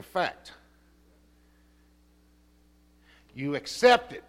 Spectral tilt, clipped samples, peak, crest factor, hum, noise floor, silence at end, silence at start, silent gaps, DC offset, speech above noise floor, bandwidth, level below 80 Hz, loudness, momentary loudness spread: -3.5 dB/octave; under 0.1%; -6 dBFS; 24 dB; none; -61 dBFS; 0.1 s; 0.15 s; none; under 0.1%; 35 dB; 15 kHz; -62 dBFS; -26 LUFS; 27 LU